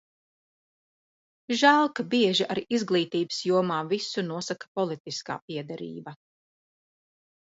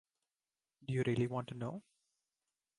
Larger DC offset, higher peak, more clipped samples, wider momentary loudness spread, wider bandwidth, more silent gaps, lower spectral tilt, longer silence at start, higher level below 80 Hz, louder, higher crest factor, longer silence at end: neither; first, -6 dBFS vs -24 dBFS; neither; about the same, 15 LU vs 16 LU; second, 8 kHz vs 11 kHz; first, 4.68-4.75 s, 5.00-5.05 s, 5.42-5.48 s vs none; second, -4.5 dB/octave vs -7.5 dB/octave; first, 1.5 s vs 0.8 s; about the same, -74 dBFS vs -72 dBFS; first, -26 LUFS vs -38 LUFS; about the same, 22 dB vs 18 dB; first, 1.35 s vs 1 s